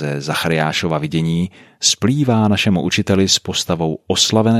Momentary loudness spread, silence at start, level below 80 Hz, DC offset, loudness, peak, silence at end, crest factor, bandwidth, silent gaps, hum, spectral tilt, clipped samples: 6 LU; 0 s; -48 dBFS; under 0.1%; -16 LUFS; 0 dBFS; 0 s; 16 dB; 15 kHz; none; none; -4 dB/octave; under 0.1%